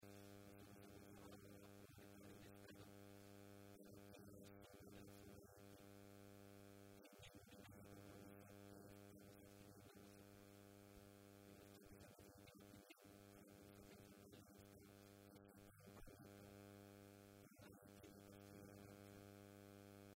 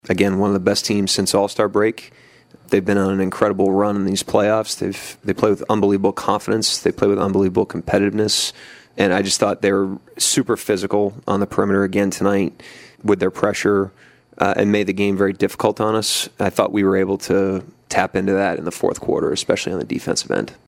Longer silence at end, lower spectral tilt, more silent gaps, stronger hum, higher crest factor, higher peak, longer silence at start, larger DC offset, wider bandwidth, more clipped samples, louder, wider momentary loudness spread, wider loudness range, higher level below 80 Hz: second, 0 s vs 0.15 s; about the same, -5 dB/octave vs -4.5 dB/octave; neither; neither; about the same, 16 dB vs 18 dB; second, -48 dBFS vs 0 dBFS; about the same, 0 s vs 0.05 s; neither; about the same, 16 kHz vs 16 kHz; neither; second, -64 LUFS vs -19 LUFS; about the same, 3 LU vs 5 LU; about the same, 2 LU vs 1 LU; second, -80 dBFS vs -52 dBFS